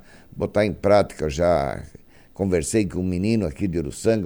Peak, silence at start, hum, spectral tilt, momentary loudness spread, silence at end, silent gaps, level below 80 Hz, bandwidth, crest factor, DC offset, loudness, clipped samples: -4 dBFS; 0.35 s; none; -6 dB/octave; 10 LU; 0 s; none; -42 dBFS; over 20 kHz; 18 dB; under 0.1%; -22 LUFS; under 0.1%